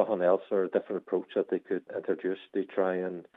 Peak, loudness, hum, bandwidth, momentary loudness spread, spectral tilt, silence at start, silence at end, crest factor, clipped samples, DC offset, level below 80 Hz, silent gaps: -12 dBFS; -31 LUFS; none; 4 kHz; 7 LU; -9 dB/octave; 0 s; 0.15 s; 18 dB; under 0.1%; under 0.1%; -88 dBFS; none